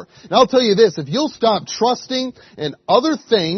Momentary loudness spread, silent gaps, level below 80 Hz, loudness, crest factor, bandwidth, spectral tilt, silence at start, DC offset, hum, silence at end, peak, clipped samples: 13 LU; none; -60 dBFS; -17 LUFS; 16 dB; 6.4 kHz; -4.5 dB/octave; 0 s; under 0.1%; none; 0 s; 0 dBFS; under 0.1%